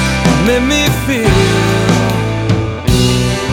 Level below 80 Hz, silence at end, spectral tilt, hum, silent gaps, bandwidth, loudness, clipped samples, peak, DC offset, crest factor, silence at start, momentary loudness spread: -24 dBFS; 0 s; -5 dB/octave; none; none; 18 kHz; -12 LUFS; under 0.1%; 0 dBFS; under 0.1%; 12 dB; 0 s; 4 LU